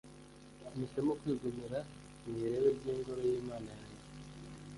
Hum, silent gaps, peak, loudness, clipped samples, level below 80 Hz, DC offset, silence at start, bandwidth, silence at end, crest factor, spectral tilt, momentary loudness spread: none; none; -20 dBFS; -38 LUFS; under 0.1%; -62 dBFS; under 0.1%; 0.05 s; 11.5 kHz; 0 s; 18 dB; -7 dB/octave; 19 LU